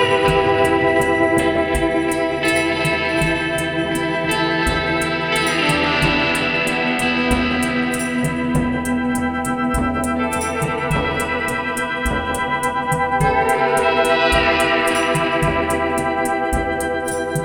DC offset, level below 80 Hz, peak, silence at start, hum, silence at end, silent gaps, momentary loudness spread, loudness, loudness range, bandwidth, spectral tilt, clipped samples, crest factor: under 0.1%; -34 dBFS; -2 dBFS; 0 s; none; 0 s; none; 5 LU; -18 LUFS; 4 LU; 18 kHz; -4.5 dB/octave; under 0.1%; 16 dB